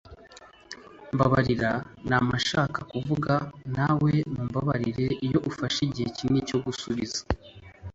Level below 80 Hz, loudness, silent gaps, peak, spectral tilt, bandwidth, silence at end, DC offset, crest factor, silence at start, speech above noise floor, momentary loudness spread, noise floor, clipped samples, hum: -48 dBFS; -27 LUFS; none; -8 dBFS; -6 dB/octave; 8 kHz; 0.05 s; under 0.1%; 20 dB; 0.05 s; 25 dB; 10 LU; -51 dBFS; under 0.1%; none